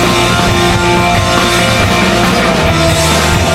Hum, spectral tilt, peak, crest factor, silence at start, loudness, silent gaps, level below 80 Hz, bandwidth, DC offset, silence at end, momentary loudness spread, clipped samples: none; -4 dB/octave; 0 dBFS; 10 dB; 0 s; -9 LUFS; none; -22 dBFS; 16.5 kHz; under 0.1%; 0 s; 1 LU; under 0.1%